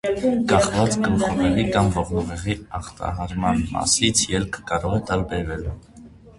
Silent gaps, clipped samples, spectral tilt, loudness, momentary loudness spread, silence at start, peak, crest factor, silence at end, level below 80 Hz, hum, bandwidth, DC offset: none; under 0.1%; -4.5 dB/octave; -22 LUFS; 11 LU; 0.05 s; -4 dBFS; 18 dB; 0.05 s; -36 dBFS; none; 11.5 kHz; under 0.1%